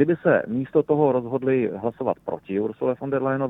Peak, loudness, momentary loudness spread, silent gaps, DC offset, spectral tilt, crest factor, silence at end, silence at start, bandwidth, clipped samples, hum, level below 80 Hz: -4 dBFS; -23 LUFS; 7 LU; none; under 0.1%; -10.5 dB/octave; 18 dB; 0 s; 0 s; 3.9 kHz; under 0.1%; none; -62 dBFS